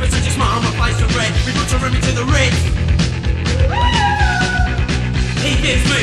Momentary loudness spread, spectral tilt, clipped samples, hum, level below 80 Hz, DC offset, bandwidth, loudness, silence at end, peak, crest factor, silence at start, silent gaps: 4 LU; -4.5 dB/octave; under 0.1%; none; -20 dBFS; under 0.1%; 12.5 kHz; -16 LUFS; 0 s; -2 dBFS; 14 dB; 0 s; none